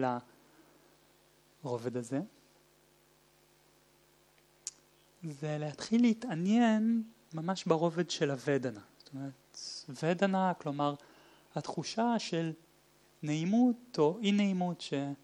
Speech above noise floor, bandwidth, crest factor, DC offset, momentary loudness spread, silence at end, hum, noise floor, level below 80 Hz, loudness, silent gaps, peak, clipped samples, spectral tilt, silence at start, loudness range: 34 dB; 11 kHz; 20 dB; under 0.1%; 17 LU; 0.1 s; none; -66 dBFS; -80 dBFS; -33 LUFS; none; -14 dBFS; under 0.1%; -6 dB/octave; 0 s; 12 LU